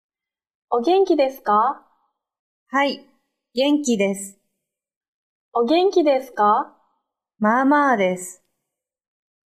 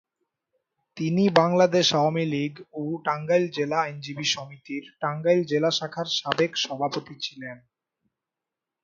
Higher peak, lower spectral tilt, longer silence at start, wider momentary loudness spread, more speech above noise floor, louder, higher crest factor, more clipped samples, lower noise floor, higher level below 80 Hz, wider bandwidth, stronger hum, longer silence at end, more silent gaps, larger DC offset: second, -6 dBFS vs 0 dBFS; about the same, -4.5 dB/octave vs -4.5 dB/octave; second, 0.7 s vs 0.95 s; about the same, 14 LU vs 14 LU; about the same, 64 dB vs 63 dB; first, -20 LUFS vs -24 LUFS; second, 16 dB vs 26 dB; neither; second, -83 dBFS vs -87 dBFS; about the same, -72 dBFS vs -70 dBFS; first, 15 kHz vs 7.6 kHz; neither; about the same, 1.15 s vs 1.25 s; first, 2.39-2.66 s, 4.96-5.01 s, 5.08-5.52 s vs none; neither